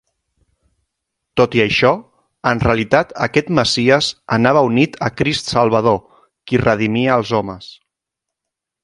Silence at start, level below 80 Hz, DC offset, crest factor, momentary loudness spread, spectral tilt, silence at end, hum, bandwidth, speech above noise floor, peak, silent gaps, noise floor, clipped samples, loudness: 1.35 s; -42 dBFS; under 0.1%; 18 dB; 7 LU; -5.5 dB/octave; 1.15 s; none; 11.5 kHz; 67 dB; 0 dBFS; none; -82 dBFS; under 0.1%; -16 LUFS